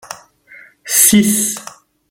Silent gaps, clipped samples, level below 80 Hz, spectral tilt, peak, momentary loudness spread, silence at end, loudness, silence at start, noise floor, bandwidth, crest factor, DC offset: none; under 0.1%; -52 dBFS; -2.5 dB/octave; 0 dBFS; 25 LU; 0.45 s; -11 LUFS; 0.05 s; -43 dBFS; 20 kHz; 16 dB; under 0.1%